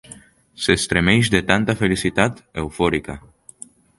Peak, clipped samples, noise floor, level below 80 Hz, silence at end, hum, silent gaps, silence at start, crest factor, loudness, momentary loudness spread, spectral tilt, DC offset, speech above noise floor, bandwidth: 0 dBFS; under 0.1%; -45 dBFS; -40 dBFS; 0.8 s; none; none; 0.1 s; 20 dB; -19 LUFS; 19 LU; -4.5 dB/octave; under 0.1%; 26 dB; 11.5 kHz